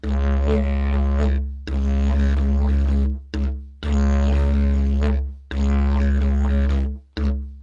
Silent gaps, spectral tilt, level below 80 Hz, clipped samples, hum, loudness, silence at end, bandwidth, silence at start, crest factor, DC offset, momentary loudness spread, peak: none; -8.5 dB/octave; -20 dBFS; under 0.1%; none; -22 LUFS; 0 s; 7.2 kHz; 0.05 s; 12 dB; under 0.1%; 7 LU; -6 dBFS